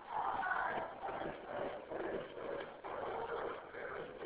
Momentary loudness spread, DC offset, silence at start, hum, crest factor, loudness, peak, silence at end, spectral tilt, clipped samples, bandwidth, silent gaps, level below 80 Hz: 8 LU; under 0.1%; 0 s; none; 18 dB; -42 LUFS; -26 dBFS; 0 s; -2.5 dB/octave; under 0.1%; 4 kHz; none; -68 dBFS